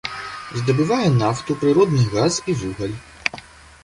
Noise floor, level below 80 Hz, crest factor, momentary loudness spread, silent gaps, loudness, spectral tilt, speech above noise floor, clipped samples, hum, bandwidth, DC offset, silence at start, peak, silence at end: -40 dBFS; -48 dBFS; 20 dB; 12 LU; none; -20 LUFS; -6 dB/octave; 21 dB; under 0.1%; none; 11.5 kHz; under 0.1%; 0.05 s; 0 dBFS; 0.4 s